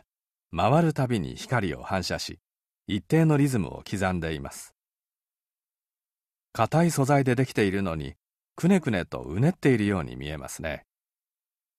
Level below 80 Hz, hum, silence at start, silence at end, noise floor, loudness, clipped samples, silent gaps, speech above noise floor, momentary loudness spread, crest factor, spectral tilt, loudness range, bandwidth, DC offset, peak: -50 dBFS; none; 0.5 s; 1 s; under -90 dBFS; -26 LUFS; under 0.1%; none; over 65 dB; 13 LU; 18 dB; -6.5 dB/octave; 4 LU; 14 kHz; under 0.1%; -8 dBFS